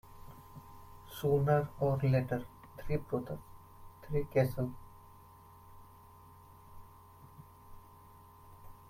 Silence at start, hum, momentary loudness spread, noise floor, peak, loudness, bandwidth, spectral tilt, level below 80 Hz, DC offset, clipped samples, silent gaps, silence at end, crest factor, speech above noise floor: 0.05 s; none; 27 LU; -57 dBFS; -16 dBFS; -34 LUFS; 16 kHz; -8 dB/octave; -56 dBFS; under 0.1%; under 0.1%; none; 0.05 s; 22 dB; 25 dB